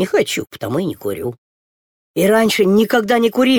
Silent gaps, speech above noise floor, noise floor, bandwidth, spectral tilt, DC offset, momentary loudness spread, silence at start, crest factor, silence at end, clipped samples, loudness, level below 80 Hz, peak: 1.38-2.14 s; over 75 dB; under -90 dBFS; 19 kHz; -5 dB/octave; under 0.1%; 11 LU; 0 s; 14 dB; 0 s; under 0.1%; -16 LUFS; -56 dBFS; -2 dBFS